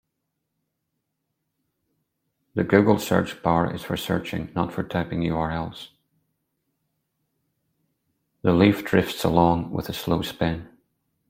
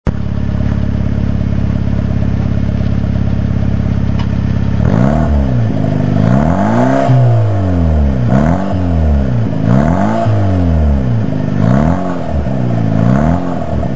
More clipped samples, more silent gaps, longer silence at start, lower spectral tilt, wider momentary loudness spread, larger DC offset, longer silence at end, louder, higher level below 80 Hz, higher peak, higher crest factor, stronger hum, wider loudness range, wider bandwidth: neither; neither; first, 2.55 s vs 0.05 s; second, -6.5 dB/octave vs -9 dB/octave; first, 11 LU vs 5 LU; second, under 0.1% vs 10%; first, 0.65 s vs 0 s; second, -23 LUFS vs -13 LUFS; second, -50 dBFS vs -20 dBFS; second, -4 dBFS vs 0 dBFS; first, 22 dB vs 12 dB; neither; first, 8 LU vs 3 LU; first, 16.5 kHz vs 7.8 kHz